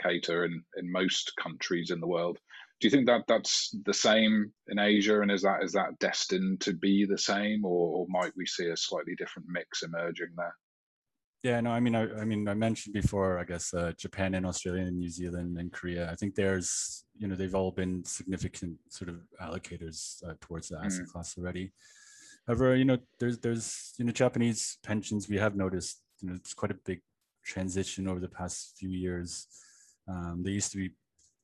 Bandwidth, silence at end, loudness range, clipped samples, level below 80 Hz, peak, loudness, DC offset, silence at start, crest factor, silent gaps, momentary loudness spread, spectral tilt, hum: 12 kHz; 0.55 s; 10 LU; under 0.1%; -58 dBFS; -12 dBFS; -31 LUFS; under 0.1%; 0 s; 20 dB; 10.63-11.02 s, 11.24-11.33 s; 14 LU; -4.5 dB/octave; none